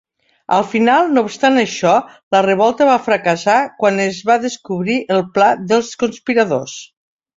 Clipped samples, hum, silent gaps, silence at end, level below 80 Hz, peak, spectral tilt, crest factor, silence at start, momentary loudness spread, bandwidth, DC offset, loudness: under 0.1%; none; 2.23-2.31 s; 0.5 s; -60 dBFS; 0 dBFS; -4.5 dB/octave; 14 dB; 0.5 s; 7 LU; 7.8 kHz; under 0.1%; -15 LUFS